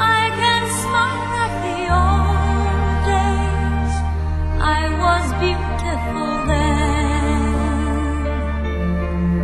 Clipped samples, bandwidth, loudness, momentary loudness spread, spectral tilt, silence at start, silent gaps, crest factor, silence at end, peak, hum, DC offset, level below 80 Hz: under 0.1%; 12.5 kHz; -19 LUFS; 6 LU; -5.5 dB/octave; 0 s; none; 14 dB; 0 s; -4 dBFS; none; 0.4%; -22 dBFS